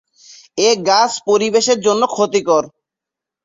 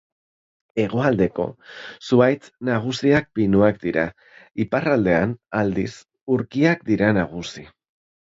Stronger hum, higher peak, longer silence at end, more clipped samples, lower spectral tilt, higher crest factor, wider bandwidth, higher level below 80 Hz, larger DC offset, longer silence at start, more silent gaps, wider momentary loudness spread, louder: neither; about the same, -2 dBFS vs -4 dBFS; first, 0.75 s vs 0.6 s; neither; second, -2.5 dB/octave vs -7 dB/octave; about the same, 14 dB vs 18 dB; about the same, 7.8 kHz vs 7.8 kHz; second, -62 dBFS vs -50 dBFS; neither; second, 0.55 s vs 0.75 s; second, none vs 6.21-6.27 s; second, 4 LU vs 15 LU; first, -15 LUFS vs -21 LUFS